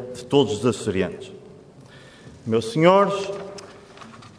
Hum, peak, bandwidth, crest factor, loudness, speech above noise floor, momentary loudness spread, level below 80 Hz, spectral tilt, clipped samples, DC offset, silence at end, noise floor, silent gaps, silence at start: none; -4 dBFS; 11 kHz; 20 dB; -21 LUFS; 26 dB; 24 LU; -60 dBFS; -6 dB/octave; under 0.1%; under 0.1%; 0.1 s; -46 dBFS; none; 0 s